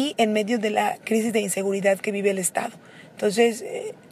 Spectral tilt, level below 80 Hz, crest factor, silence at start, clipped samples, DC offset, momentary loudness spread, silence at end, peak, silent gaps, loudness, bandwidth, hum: -4 dB/octave; -76 dBFS; 18 dB; 0 s; under 0.1%; under 0.1%; 9 LU; 0.15 s; -6 dBFS; none; -23 LUFS; 15.5 kHz; none